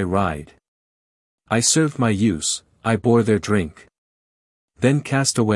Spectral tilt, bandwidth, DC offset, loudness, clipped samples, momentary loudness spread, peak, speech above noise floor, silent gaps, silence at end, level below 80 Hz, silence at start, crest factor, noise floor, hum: -4.5 dB/octave; 12 kHz; under 0.1%; -19 LUFS; under 0.1%; 8 LU; -4 dBFS; over 71 dB; 0.68-1.38 s, 3.98-4.68 s; 0 s; -52 dBFS; 0 s; 18 dB; under -90 dBFS; none